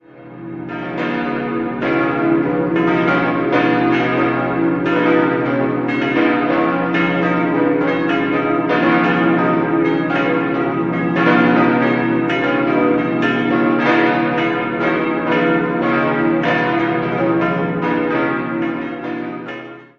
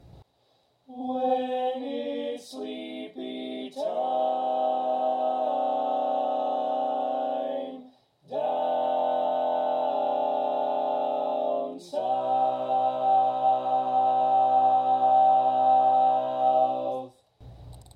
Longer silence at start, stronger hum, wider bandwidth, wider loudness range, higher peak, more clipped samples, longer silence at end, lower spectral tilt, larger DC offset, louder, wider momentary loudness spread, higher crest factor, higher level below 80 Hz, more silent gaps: about the same, 0.15 s vs 0.15 s; neither; second, 6.6 kHz vs 9.4 kHz; second, 2 LU vs 9 LU; first, 0 dBFS vs -12 dBFS; neither; about the same, 0.15 s vs 0.15 s; first, -8 dB/octave vs -6 dB/octave; neither; first, -16 LUFS vs -26 LUFS; second, 7 LU vs 14 LU; about the same, 16 dB vs 14 dB; first, -52 dBFS vs -64 dBFS; neither